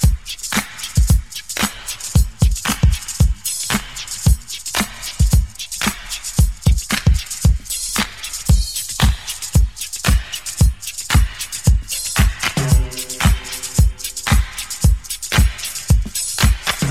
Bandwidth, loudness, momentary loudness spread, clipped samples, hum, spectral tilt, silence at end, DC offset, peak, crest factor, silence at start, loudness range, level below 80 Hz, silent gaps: 16 kHz; -19 LUFS; 6 LU; under 0.1%; none; -3.5 dB/octave; 0 s; 0.7%; 0 dBFS; 16 dB; 0 s; 1 LU; -20 dBFS; none